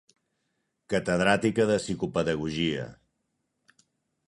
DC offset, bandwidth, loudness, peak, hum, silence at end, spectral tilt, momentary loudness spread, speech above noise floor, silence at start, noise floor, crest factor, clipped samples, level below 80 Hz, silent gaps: under 0.1%; 11.5 kHz; -27 LUFS; -6 dBFS; none; 1.35 s; -5.5 dB/octave; 7 LU; 52 dB; 0.9 s; -78 dBFS; 24 dB; under 0.1%; -56 dBFS; none